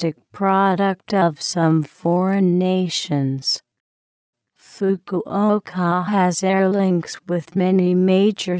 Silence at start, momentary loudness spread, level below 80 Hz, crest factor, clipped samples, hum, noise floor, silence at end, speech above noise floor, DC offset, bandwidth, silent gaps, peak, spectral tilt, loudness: 0 s; 7 LU; -66 dBFS; 14 dB; under 0.1%; none; under -90 dBFS; 0 s; over 71 dB; under 0.1%; 8 kHz; 3.80-4.33 s; -6 dBFS; -6 dB/octave; -19 LUFS